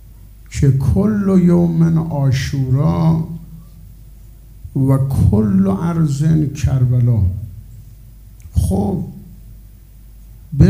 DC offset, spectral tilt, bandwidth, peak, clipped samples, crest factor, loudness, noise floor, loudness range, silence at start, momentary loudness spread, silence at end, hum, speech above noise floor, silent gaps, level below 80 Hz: under 0.1%; -8.5 dB/octave; 16 kHz; 0 dBFS; under 0.1%; 16 dB; -16 LUFS; -40 dBFS; 5 LU; 0.1 s; 15 LU; 0 s; none; 26 dB; none; -32 dBFS